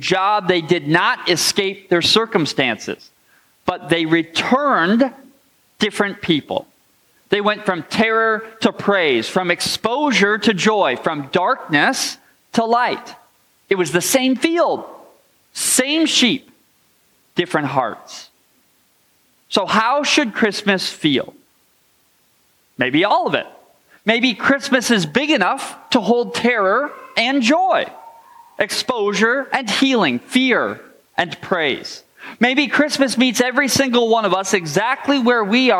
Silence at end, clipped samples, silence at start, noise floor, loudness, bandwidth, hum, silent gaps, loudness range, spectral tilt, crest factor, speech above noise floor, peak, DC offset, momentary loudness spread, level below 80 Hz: 0 s; under 0.1%; 0 s; -59 dBFS; -17 LUFS; 16.5 kHz; none; none; 3 LU; -3.5 dB/octave; 18 dB; 42 dB; -2 dBFS; under 0.1%; 9 LU; -64 dBFS